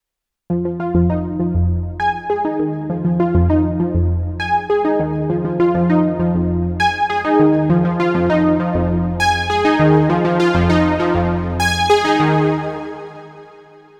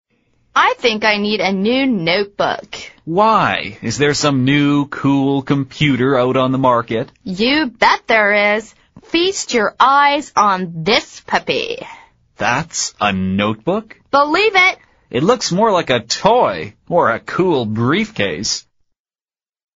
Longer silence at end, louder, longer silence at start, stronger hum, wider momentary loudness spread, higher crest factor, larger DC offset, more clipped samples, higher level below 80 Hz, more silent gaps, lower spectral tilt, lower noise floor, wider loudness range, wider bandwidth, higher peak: second, 0.4 s vs 1.15 s; about the same, -16 LUFS vs -15 LUFS; about the same, 0.5 s vs 0.55 s; neither; about the same, 7 LU vs 9 LU; about the same, 14 dB vs 16 dB; neither; neither; first, -32 dBFS vs -50 dBFS; neither; first, -7 dB/octave vs -3 dB/octave; second, -63 dBFS vs under -90 dBFS; about the same, 3 LU vs 3 LU; first, 12 kHz vs 8 kHz; about the same, -2 dBFS vs 0 dBFS